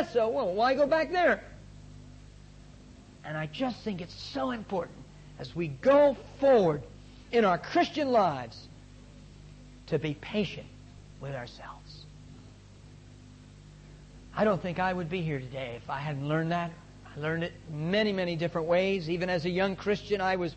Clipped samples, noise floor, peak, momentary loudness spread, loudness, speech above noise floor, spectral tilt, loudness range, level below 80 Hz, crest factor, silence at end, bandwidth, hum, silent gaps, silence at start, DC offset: under 0.1%; -51 dBFS; -14 dBFS; 24 LU; -29 LUFS; 23 dB; -6.5 dB/octave; 11 LU; -54 dBFS; 16 dB; 0 s; 8.6 kHz; 50 Hz at -50 dBFS; none; 0 s; under 0.1%